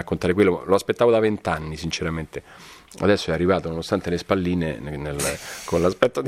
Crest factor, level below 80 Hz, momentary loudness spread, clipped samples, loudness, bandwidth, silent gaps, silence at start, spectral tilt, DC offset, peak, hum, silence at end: 22 dB; -44 dBFS; 11 LU; under 0.1%; -23 LUFS; 16 kHz; none; 0 s; -5.5 dB/octave; under 0.1%; 0 dBFS; none; 0 s